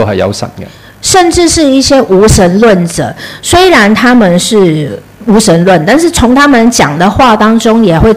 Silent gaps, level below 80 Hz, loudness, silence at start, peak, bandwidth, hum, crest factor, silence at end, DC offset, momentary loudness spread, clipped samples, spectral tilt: none; -24 dBFS; -6 LUFS; 0 s; 0 dBFS; 16 kHz; none; 6 dB; 0 s; 0.7%; 10 LU; 5%; -4.5 dB/octave